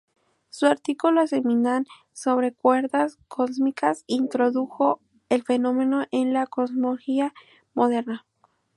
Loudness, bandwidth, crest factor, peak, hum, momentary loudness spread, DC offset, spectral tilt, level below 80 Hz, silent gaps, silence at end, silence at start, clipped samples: -24 LUFS; 11.5 kHz; 18 dB; -6 dBFS; none; 7 LU; under 0.1%; -5 dB/octave; -76 dBFS; none; 0.6 s; 0.55 s; under 0.1%